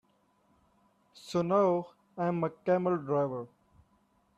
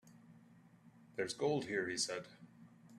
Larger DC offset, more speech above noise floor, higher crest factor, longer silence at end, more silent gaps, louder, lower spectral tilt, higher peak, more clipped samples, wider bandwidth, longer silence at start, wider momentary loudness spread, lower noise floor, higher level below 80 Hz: neither; first, 40 dB vs 25 dB; about the same, 18 dB vs 20 dB; first, 0.9 s vs 0 s; neither; first, -31 LUFS vs -39 LUFS; first, -7.5 dB/octave vs -3.5 dB/octave; first, -14 dBFS vs -24 dBFS; neither; second, 12 kHz vs 13.5 kHz; first, 1.25 s vs 0.05 s; second, 17 LU vs 22 LU; first, -70 dBFS vs -64 dBFS; first, -74 dBFS vs -80 dBFS